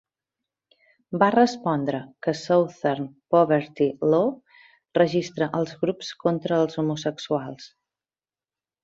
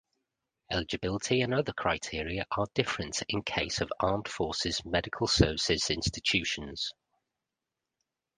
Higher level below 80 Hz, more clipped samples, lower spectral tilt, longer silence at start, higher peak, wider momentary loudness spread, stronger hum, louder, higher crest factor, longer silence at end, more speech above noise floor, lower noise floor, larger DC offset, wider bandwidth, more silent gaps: second, -68 dBFS vs -48 dBFS; neither; first, -6.5 dB/octave vs -4 dB/octave; first, 1.1 s vs 0.7 s; first, -4 dBFS vs -8 dBFS; about the same, 9 LU vs 8 LU; neither; first, -24 LUFS vs -30 LUFS; about the same, 20 dB vs 24 dB; second, 1.2 s vs 1.45 s; first, over 67 dB vs 57 dB; about the same, under -90 dBFS vs -88 dBFS; neither; second, 7.8 kHz vs 10 kHz; neither